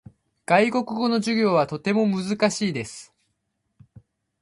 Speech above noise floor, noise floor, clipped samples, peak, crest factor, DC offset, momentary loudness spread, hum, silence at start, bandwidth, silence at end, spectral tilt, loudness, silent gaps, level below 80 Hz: 53 dB; -75 dBFS; under 0.1%; -4 dBFS; 20 dB; under 0.1%; 13 LU; none; 0.5 s; 11.5 kHz; 1.4 s; -5 dB/octave; -22 LUFS; none; -64 dBFS